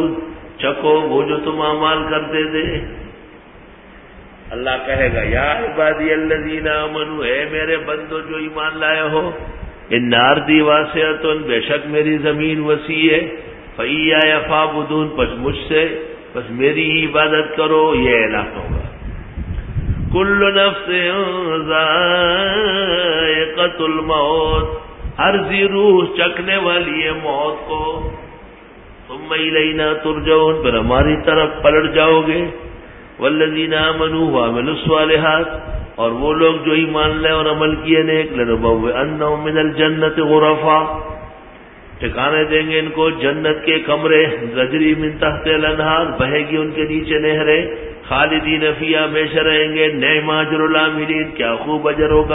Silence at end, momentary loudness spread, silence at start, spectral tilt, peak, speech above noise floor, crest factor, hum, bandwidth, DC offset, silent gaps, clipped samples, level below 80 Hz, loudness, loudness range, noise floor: 0 s; 11 LU; 0 s; -9.5 dB/octave; 0 dBFS; 25 dB; 16 dB; none; 4 kHz; under 0.1%; none; under 0.1%; -34 dBFS; -15 LUFS; 4 LU; -40 dBFS